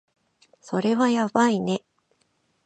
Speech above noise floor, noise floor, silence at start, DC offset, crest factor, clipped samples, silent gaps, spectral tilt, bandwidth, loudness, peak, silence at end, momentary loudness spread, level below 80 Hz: 47 dB; -69 dBFS; 0.65 s; under 0.1%; 20 dB; under 0.1%; none; -5.5 dB/octave; 8.8 kHz; -23 LUFS; -6 dBFS; 0.85 s; 9 LU; -70 dBFS